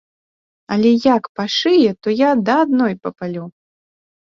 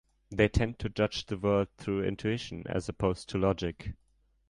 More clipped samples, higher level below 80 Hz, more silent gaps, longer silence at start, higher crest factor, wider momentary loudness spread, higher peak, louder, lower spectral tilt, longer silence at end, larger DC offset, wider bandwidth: neither; second, -60 dBFS vs -44 dBFS; first, 1.29-1.35 s vs none; first, 0.7 s vs 0.3 s; about the same, 16 dB vs 20 dB; first, 13 LU vs 8 LU; first, -2 dBFS vs -10 dBFS; first, -16 LUFS vs -31 LUFS; about the same, -6 dB/octave vs -6.5 dB/octave; first, 0.75 s vs 0.55 s; neither; second, 7.2 kHz vs 11 kHz